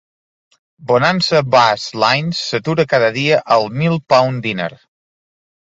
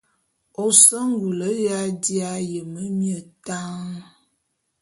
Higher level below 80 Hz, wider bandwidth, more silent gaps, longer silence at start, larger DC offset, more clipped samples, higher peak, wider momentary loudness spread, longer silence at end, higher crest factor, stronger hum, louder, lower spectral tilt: first, -56 dBFS vs -68 dBFS; second, 8 kHz vs 12 kHz; neither; first, 0.8 s vs 0.6 s; neither; neither; about the same, 0 dBFS vs 0 dBFS; second, 8 LU vs 21 LU; first, 1.05 s vs 0.8 s; second, 16 dB vs 24 dB; neither; first, -15 LUFS vs -19 LUFS; first, -5 dB/octave vs -3.5 dB/octave